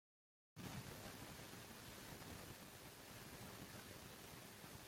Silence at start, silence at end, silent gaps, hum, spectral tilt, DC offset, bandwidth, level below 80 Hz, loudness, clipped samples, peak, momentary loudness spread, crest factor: 0.55 s; 0 s; none; none; -3.5 dB/octave; under 0.1%; 16.5 kHz; -72 dBFS; -55 LUFS; under 0.1%; -40 dBFS; 4 LU; 18 dB